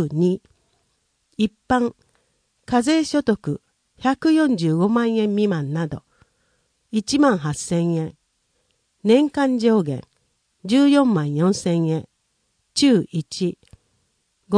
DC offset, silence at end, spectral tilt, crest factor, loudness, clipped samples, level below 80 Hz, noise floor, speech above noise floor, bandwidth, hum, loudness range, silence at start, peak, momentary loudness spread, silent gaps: under 0.1%; 0 s; -6 dB/octave; 18 dB; -20 LUFS; under 0.1%; -56 dBFS; -69 dBFS; 50 dB; 10.5 kHz; none; 4 LU; 0 s; -4 dBFS; 11 LU; none